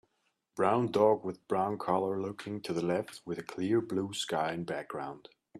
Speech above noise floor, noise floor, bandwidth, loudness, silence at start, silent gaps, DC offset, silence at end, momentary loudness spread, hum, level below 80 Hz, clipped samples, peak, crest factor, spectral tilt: 47 dB; -78 dBFS; 13.5 kHz; -32 LUFS; 0.55 s; none; under 0.1%; 0 s; 13 LU; none; -74 dBFS; under 0.1%; -12 dBFS; 20 dB; -5.5 dB/octave